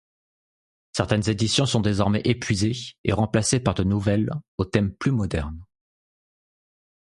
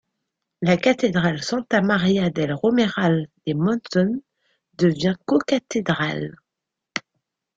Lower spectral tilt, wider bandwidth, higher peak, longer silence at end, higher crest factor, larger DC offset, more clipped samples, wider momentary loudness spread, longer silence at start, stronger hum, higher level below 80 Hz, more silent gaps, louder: about the same, -5.5 dB/octave vs -6 dB/octave; first, 11.5 kHz vs 7.8 kHz; about the same, -4 dBFS vs -4 dBFS; first, 1.55 s vs 0.6 s; about the same, 22 dB vs 18 dB; neither; neither; second, 8 LU vs 11 LU; first, 0.95 s vs 0.6 s; neither; first, -42 dBFS vs -58 dBFS; first, 2.98-3.04 s, 4.48-4.58 s vs none; about the same, -23 LUFS vs -22 LUFS